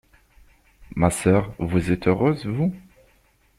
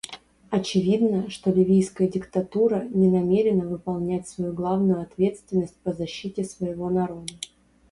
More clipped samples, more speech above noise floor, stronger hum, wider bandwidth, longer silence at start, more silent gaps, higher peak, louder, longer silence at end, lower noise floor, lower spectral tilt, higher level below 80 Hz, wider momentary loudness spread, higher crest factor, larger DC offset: neither; first, 39 dB vs 19 dB; neither; first, 15.5 kHz vs 11.5 kHz; first, 0.9 s vs 0.05 s; neither; about the same, -6 dBFS vs -8 dBFS; about the same, -22 LUFS vs -24 LUFS; first, 0.8 s vs 0.45 s; first, -60 dBFS vs -42 dBFS; about the same, -7 dB/octave vs -7 dB/octave; first, -46 dBFS vs -56 dBFS; second, 6 LU vs 10 LU; about the same, 18 dB vs 16 dB; neither